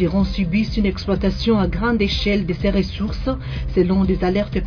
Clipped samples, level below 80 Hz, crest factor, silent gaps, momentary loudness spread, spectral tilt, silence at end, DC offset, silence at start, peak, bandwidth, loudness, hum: under 0.1%; -28 dBFS; 14 dB; none; 6 LU; -7.5 dB/octave; 0 s; under 0.1%; 0 s; -6 dBFS; 5.4 kHz; -20 LUFS; none